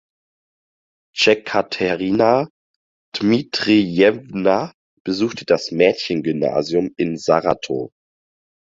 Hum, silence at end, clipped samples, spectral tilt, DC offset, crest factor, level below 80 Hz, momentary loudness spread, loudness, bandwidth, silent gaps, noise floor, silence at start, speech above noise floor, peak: none; 0.75 s; under 0.1%; -5.5 dB/octave; under 0.1%; 18 dB; -56 dBFS; 10 LU; -18 LUFS; 7.8 kHz; 2.50-3.12 s, 4.74-5.05 s; under -90 dBFS; 1.15 s; over 72 dB; 0 dBFS